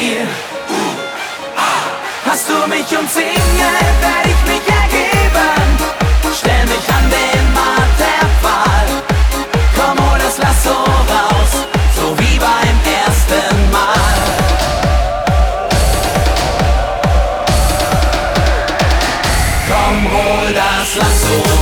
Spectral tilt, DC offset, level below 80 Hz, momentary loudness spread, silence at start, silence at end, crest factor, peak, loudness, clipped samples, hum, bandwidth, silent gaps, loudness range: -4 dB/octave; under 0.1%; -16 dBFS; 3 LU; 0 s; 0 s; 12 dB; 0 dBFS; -13 LUFS; under 0.1%; none; 19.5 kHz; none; 2 LU